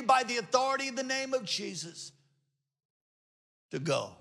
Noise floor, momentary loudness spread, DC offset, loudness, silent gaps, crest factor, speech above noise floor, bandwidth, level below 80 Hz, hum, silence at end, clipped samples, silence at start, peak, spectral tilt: -79 dBFS; 15 LU; under 0.1%; -31 LUFS; 2.85-3.69 s; 22 dB; 46 dB; 13 kHz; -82 dBFS; none; 0.05 s; under 0.1%; 0 s; -12 dBFS; -3 dB/octave